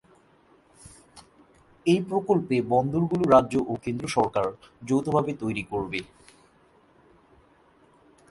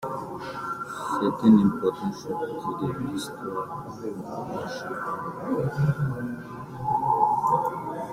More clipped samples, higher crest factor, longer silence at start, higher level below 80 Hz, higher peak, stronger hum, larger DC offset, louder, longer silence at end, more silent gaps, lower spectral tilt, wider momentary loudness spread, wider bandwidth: neither; about the same, 22 dB vs 20 dB; first, 0.85 s vs 0 s; about the same, -56 dBFS vs -58 dBFS; about the same, -6 dBFS vs -6 dBFS; neither; neither; about the same, -25 LUFS vs -27 LUFS; first, 2.25 s vs 0 s; neither; about the same, -7 dB/octave vs -7.5 dB/octave; about the same, 11 LU vs 13 LU; second, 11.5 kHz vs 15.5 kHz